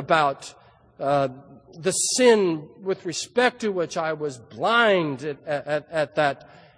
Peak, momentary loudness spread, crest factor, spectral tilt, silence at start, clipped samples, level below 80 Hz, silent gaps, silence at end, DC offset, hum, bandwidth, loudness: -4 dBFS; 13 LU; 20 dB; -3.5 dB/octave; 0 s; under 0.1%; -66 dBFS; none; 0.45 s; under 0.1%; none; 10.5 kHz; -23 LUFS